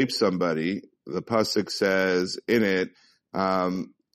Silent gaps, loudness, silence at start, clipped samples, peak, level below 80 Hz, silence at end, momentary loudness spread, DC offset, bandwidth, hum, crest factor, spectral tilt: none; -26 LUFS; 0 s; under 0.1%; -8 dBFS; -64 dBFS; 0.3 s; 11 LU; under 0.1%; 13.5 kHz; none; 18 dB; -5 dB/octave